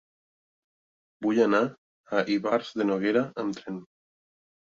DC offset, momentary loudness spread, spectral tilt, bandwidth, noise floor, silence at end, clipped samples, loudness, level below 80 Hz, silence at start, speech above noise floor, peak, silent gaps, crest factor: under 0.1%; 11 LU; -6 dB/octave; 7.6 kHz; under -90 dBFS; 0.85 s; under 0.1%; -27 LUFS; -74 dBFS; 1.2 s; over 64 dB; -10 dBFS; 1.78-2.04 s; 18 dB